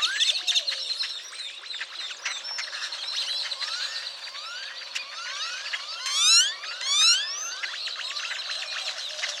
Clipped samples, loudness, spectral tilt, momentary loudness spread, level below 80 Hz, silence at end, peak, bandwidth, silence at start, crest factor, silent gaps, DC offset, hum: under 0.1%; -25 LUFS; 5.5 dB/octave; 15 LU; under -90 dBFS; 0 s; -6 dBFS; 17 kHz; 0 s; 22 dB; none; under 0.1%; none